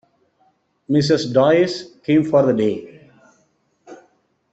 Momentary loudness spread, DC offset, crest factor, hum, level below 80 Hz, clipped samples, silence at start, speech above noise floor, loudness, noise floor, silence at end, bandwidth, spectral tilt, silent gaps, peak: 7 LU; under 0.1%; 18 dB; none; -58 dBFS; under 0.1%; 0.9 s; 47 dB; -17 LUFS; -63 dBFS; 0.55 s; 8.2 kHz; -6.5 dB/octave; none; -2 dBFS